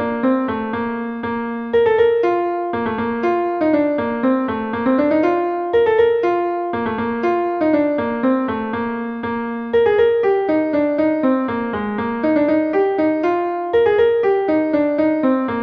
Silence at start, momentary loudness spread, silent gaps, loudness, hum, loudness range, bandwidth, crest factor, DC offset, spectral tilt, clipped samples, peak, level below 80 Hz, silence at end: 0 s; 8 LU; none; -18 LUFS; none; 2 LU; 5.8 kHz; 14 dB; under 0.1%; -8 dB/octave; under 0.1%; -4 dBFS; -52 dBFS; 0 s